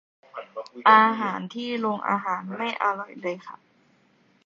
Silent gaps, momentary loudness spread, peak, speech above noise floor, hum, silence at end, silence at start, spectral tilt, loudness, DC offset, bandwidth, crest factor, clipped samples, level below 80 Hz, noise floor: none; 22 LU; -2 dBFS; 39 dB; none; 0.9 s; 0.35 s; -5.5 dB/octave; -23 LUFS; under 0.1%; 7.4 kHz; 22 dB; under 0.1%; -78 dBFS; -62 dBFS